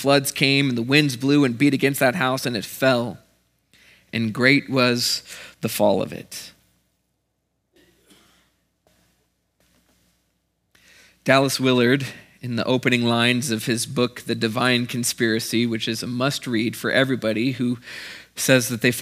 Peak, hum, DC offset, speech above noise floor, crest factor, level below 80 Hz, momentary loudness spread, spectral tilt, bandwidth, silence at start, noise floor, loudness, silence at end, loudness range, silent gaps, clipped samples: 0 dBFS; none; under 0.1%; 53 dB; 22 dB; -66 dBFS; 13 LU; -4.5 dB/octave; 16 kHz; 0 s; -73 dBFS; -21 LUFS; 0 s; 6 LU; none; under 0.1%